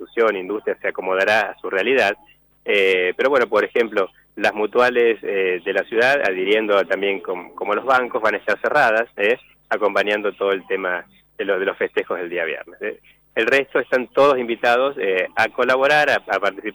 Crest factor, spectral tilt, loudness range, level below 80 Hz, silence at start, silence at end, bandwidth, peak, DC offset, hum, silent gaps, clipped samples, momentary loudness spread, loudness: 14 dB; -4 dB/octave; 4 LU; -64 dBFS; 0 s; 0 s; over 20 kHz; -6 dBFS; under 0.1%; none; none; under 0.1%; 9 LU; -19 LUFS